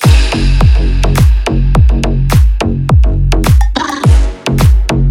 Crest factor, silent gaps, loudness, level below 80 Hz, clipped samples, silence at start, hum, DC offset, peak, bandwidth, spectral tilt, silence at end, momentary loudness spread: 8 dB; none; -11 LUFS; -10 dBFS; 0.3%; 0 s; none; under 0.1%; 0 dBFS; 15.5 kHz; -6 dB/octave; 0 s; 3 LU